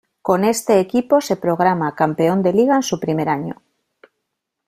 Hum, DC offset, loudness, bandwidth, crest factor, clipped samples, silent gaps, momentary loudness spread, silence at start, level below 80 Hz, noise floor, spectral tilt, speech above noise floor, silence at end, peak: none; under 0.1%; -17 LUFS; 16 kHz; 16 dB; under 0.1%; none; 6 LU; 0.25 s; -58 dBFS; -77 dBFS; -5.5 dB/octave; 60 dB; 1.15 s; -2 dBFS